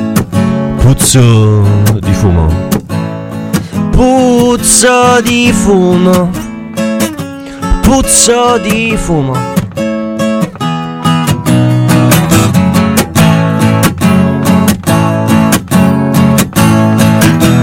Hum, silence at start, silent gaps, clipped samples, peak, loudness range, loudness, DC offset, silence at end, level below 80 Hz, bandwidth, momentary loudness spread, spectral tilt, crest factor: none; 0 s; none; 0.5%; 0 dBFS; 3 LU; -9 LUFS; under 0.1%; 0 s; -24 dBFS; over 20 kHz; 10 LU; -5 dB/octave; 8 dB